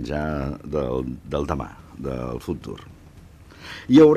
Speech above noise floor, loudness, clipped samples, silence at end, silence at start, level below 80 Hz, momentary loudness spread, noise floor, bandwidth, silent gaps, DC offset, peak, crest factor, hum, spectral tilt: 25 dB; -25 LUFS; under 0.1%; 0 s; 0 s; -40 dBFS; 15 LU; -46 dBFS; 12 kHz; none; under 0.1%; -4 dBFS; 18 dB; none; -7.5 dB/octave